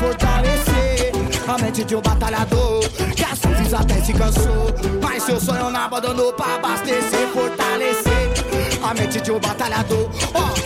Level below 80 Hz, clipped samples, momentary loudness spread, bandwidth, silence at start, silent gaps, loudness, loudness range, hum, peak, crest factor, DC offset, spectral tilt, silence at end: -24 dBFS; under 0.1%; 3 LU; 16.5 kHz; 0 s; none; -19 LUFS; 1 LU; none; -8 dBFS; 10 dB; under 0.1%; -4.5 dB/octave; 0 s